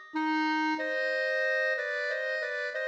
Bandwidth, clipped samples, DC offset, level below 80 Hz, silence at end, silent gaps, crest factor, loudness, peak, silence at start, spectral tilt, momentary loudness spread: 8.6 kHz; under 0.1%; under 0.1%; -88 dBFS; 0 s; none; 12 dB; -29 LUFS; -20 dBFS; 0 s; -2 dB/octave; 4 LU